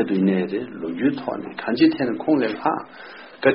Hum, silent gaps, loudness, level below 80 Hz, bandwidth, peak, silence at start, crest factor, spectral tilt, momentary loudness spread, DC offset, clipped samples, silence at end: none; none; -22 LUFS; -62 dBFS; 5.6 kHz; -2 dBFS; 0 s; 20 dB; -5 dB/octave; 11 LU; under 0.1%; under 0.1%; 0 s